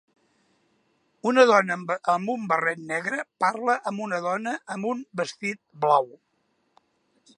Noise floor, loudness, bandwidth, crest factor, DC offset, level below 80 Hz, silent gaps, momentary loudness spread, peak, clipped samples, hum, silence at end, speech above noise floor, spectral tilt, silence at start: -71 dBFS; -25 LUFS; 11 kHz; 22 dB; under 0.1%; -80 dBFS; none; 12 LU; -4 dBFS; under 0.1%; none; 1.3 s; 47 dB; -4.5 dB/octave; 1.25 s